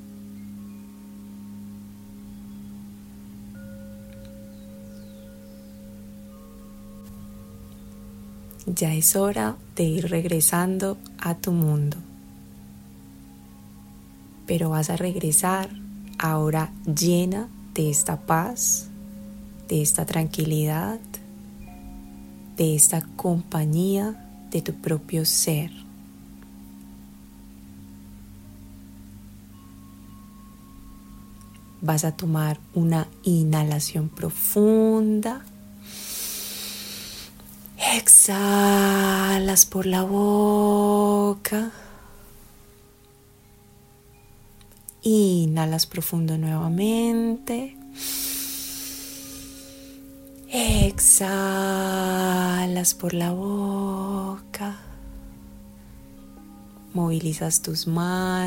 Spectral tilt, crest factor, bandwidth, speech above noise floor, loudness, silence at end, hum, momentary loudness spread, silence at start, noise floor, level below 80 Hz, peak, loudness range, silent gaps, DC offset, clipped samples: -4 dB/octave; 24 dB; 16.5 kHz; 31 dB; -22 LUFS; 0 s; none; 25 LU; 0 s; -53 dBFS; -44 dBFS; 0 dBFS; 23 LU; none; under 0.1%; under 0.1%